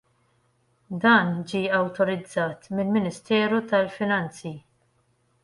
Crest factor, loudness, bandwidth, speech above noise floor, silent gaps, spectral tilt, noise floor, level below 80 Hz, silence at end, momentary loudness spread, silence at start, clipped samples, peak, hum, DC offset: 20 dB; -24 LUFS; 11.5 kHz; 43 dB; none; -6 dB/octave; -67 dBFS; -66 dBFS; 0.85 s; 15 LU; 0.9 s; under 0.1%; -6 dBFS; none; under 0.1%